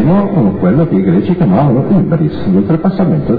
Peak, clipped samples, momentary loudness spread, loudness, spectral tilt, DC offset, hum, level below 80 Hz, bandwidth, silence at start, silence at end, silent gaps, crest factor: 0 dBFS; under 0.1%; 3 LU; -11 LUFS; -12.5 dB/octave; under 0.1%; none; -34 dBFS; 4.8 kHz; 0 s; 0 s; none; 10 dB